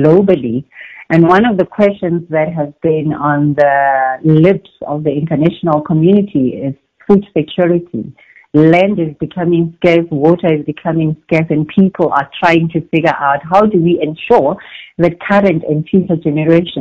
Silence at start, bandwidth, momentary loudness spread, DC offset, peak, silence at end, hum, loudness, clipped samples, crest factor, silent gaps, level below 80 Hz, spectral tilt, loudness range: 0 s; 8 kHz; 8 LU; under 0.1%; 0 dBFS; 0 s; none; -12 LUFS; 0.8%; 12 dB; none; -46 dBFS; -9 dB/octave; 1 LU